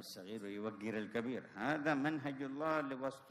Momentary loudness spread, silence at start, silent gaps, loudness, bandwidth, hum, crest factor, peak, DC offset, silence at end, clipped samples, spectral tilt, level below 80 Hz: 9 LU; 0 s; none; -40 LUFS; 14 kHz; none; 18 dB; -22 dBFS; under 0.1%; 0 s; under 0.1%; -6 dB/octave; -80 dBFS